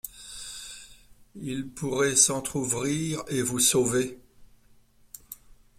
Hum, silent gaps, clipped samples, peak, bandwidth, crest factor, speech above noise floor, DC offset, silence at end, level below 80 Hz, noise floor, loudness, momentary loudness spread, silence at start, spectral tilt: none; none; under 0.1%; -6 dBFS; 16 kHz; 24 dB; 32 dB; under 0.1%; 0.45 s; -56 dBFS; -58 dBFS; -25 LUFS; 23 LU; 0.05 s; -3 dB/octave